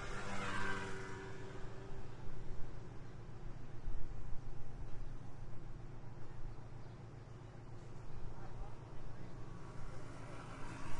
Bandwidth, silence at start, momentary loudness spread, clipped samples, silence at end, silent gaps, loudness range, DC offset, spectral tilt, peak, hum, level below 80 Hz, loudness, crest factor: 10 kHz; 0 s; 10 LU; under 0.1%; 0 s; none; 6 LU; under 0.1%; -5.5 dB/octave; -24 dBFS; none; -50 dBFS; -50 LUFS; 14 dB